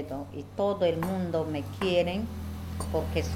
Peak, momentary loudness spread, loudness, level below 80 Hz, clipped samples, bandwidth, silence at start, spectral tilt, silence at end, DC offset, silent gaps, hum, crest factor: -14 dBFS; 11 LU; -30 LUFS; -44 dBFS; under 0.1%; 16.5 kHz; 0 s; -6.5 dB/octave; 0 s; under 0.1%; none; none; 16 dB